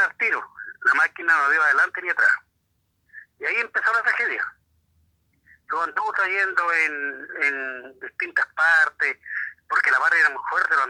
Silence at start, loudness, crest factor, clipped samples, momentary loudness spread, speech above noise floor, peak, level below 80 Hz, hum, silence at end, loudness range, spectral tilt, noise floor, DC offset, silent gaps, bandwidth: 0 s; -21 LUFS; 16 dB; under 0.1%; 12 LU; 49 dB; -6 dBFS; -74 dBFS; none; 0 s; 4 LU; -1 dB/octave; -71 dBFS; under 0.1%; none; 11.5 kHz